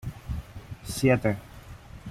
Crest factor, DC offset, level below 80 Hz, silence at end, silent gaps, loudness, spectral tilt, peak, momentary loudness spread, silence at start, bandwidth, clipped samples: 20 dB; under 0.1%; -44 dBFS; 0 s; none; -28 LUFS; -6 dB/octave; -10 dBFS; 23 LU; 0.05 s; 15.5 kHz; under 0.1%